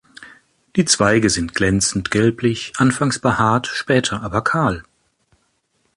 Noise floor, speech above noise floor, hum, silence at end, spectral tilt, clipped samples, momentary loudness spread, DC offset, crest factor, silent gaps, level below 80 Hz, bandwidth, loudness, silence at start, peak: -66 dBFS; 48 dB; none; 1.15 s; -4 dB/octave; under 0.1%; 6 LU; under 0.1%; 18 dB; none; -42 dBFS; 11.5 kHz; -18 LUFS; 0.2 s; -2 dBFS